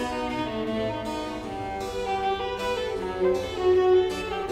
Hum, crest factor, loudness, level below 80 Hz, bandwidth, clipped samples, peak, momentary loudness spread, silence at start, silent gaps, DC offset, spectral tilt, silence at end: none; 14 dB; -27 LUFS; -46 dBFS; 13.5 kHz; under 0.1%; -12 dBFS; 10 LU; 0 s; none; under 0.1%; -5.5 dB/octave; 0 s